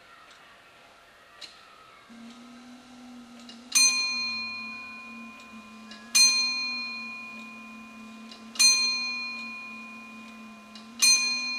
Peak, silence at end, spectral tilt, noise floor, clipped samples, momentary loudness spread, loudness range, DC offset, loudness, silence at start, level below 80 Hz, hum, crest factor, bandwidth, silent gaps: -8 dBFS; 0 s; 2.5 dB/octave; -54 dBFS; under 0.1%; 26 LU; 4 LU; under 0.1%; -22 LUFS; 0.1 s; -74 dBFS; none; 22 dB; 15.5 kHz; none